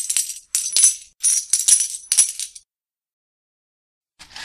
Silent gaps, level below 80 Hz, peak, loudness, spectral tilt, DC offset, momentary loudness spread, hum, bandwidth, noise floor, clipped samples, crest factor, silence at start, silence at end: 3.13-4.01 s; -68 dBFS; 0 dBFS; -16 LUFS; 5.5 dB/octave; under 0.1%; 9 LU; none; 15 kHz; -83 dBFS; under 0.1%; 22 dB; 0 s; 0 s